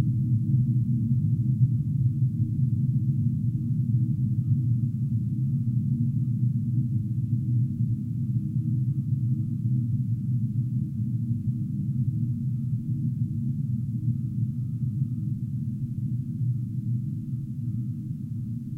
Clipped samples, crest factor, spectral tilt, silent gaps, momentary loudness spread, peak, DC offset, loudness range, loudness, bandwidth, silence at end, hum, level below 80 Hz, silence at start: under 0.1%; 16 dB; -12 dB/octave; none; 6 LU; -10 dBFS; under 0.1%; 4 LU; -27 LUFS; 0.6 kHz; 0 s; none; -52 dBFS; 0 s